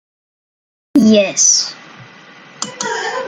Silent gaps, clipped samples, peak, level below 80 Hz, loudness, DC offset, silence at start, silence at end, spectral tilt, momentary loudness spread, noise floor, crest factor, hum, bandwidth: none; under 0.1%; 0 dBFS; -62 dBFS; -13 LUFS; under 0.1%; 0.95 s; 0 s; -2.5 dB/octave; 15 LU; -40 dBFS; 16 dB; none; 11.5 kHz